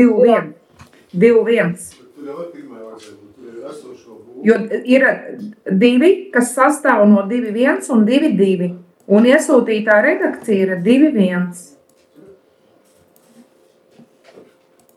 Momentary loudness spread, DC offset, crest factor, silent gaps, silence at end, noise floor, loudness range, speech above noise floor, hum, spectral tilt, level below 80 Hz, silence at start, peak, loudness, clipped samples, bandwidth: 22 LU; under 0.1%; 16 dB; none; 3.35 s; -54 dBFS; 8 LU; 39 dB; none; -6 dB/octave; -70 dBFS; 0 s; 0 dBFS; -14 LUFS; under 0.1%; 12.5 kHz